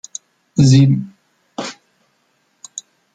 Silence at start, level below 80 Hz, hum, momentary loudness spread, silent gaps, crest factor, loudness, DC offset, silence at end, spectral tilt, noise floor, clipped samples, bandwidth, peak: 0.55 s; -52 dBFS; none; 23 LU; none; 16 dB; -14 LUFS; under 0.1%; 0.35 s; -6.5 dB/octave; -63 dBFS; under 0.1%; 9.2 kHz; -2 dBFS